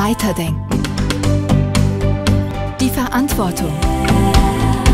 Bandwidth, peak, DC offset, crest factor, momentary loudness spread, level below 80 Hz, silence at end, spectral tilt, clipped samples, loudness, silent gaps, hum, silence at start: 16.5 kHz; 0 dBFS; under 0.1%; 14 dB; 5 LU; -22 dBFS; 0 s; -6 dB/octave; under 0.1%; -16 LUFS; none; none; 0 s